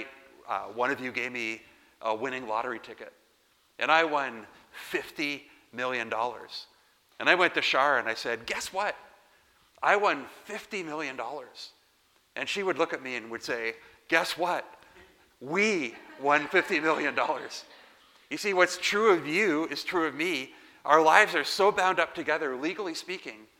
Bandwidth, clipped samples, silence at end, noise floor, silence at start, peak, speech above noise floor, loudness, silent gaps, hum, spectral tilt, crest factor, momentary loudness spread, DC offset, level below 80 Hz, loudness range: 17 kHz; under 0.1%; 0.15 s; -67 dBFS; 0 s; -2 dBFS; 38 dB; -28 LUFS; none; none; -3 dB/octave; 26 dB; 17 LU; under 0.1%; -72 dBFS; 8 LU